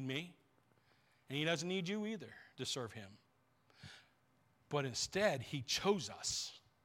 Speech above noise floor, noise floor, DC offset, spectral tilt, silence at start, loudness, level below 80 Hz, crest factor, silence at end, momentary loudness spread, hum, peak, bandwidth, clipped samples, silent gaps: 35 dB; -75 dBFS; under 0.1%; -3.5 dB/octave; 0 s; -40 LUFS; -74 dBFS; 22 dB; 0.25 s; 20 LU; none; -20 dBFS; 16.5 kHz; under 0.1%; none